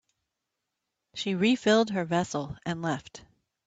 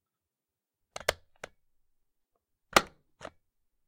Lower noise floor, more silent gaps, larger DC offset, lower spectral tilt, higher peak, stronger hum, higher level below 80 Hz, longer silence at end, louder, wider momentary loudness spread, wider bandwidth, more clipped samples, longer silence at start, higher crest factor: second, -85 dBFS vs -90 dBFS; neither; neither; first, -5 dB/octave vs -2 dB/octave; second, -12 dBFS vs -8 dBFS; neither; about the same, -64 dBFS vs -60 dBFS; second, 0.45 s vs 0.6 s; about the same, -28 LUFS vs -29 LUFS; second, 13 LU vs 23 LU; second, 9 kHz vs 16 kHz; neither; about the same, 1.15 s vs 1.1 s; second, 18 dB vs 30 dB